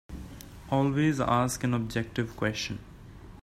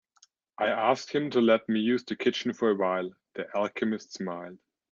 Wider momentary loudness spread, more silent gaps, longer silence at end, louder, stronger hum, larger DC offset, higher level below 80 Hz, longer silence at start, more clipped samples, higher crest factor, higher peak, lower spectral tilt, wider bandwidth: first, 21 LU vs 12 LU; neither; second, 0 s vs 0.35 s; about the same, -29 LUFS vs -28 LUFS; neither; neither; first, -50 dBFS vs -76 dBFS; second, 0.1 s vs 0.6 s; neither; about the same, 18 dB vs 20 dB; second, -12 dBFS vs -8 dBFS; about the same, -5.5 dB/octave vs -5.5 dB/octave; first, 15 kHz vs 7.4 kHz